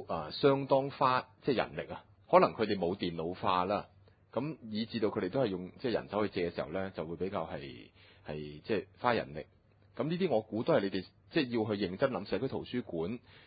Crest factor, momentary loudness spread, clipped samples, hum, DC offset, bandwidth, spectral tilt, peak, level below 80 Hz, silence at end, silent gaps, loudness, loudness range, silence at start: 24 dB; 13 LU; under 0.1%; none; under 0.1%; 4.9 kHz; -4.5 dB/octave; -10 dBFS; -62 dBFS; 0.3 s; none; -34 LUFS; 6 LU; 0 s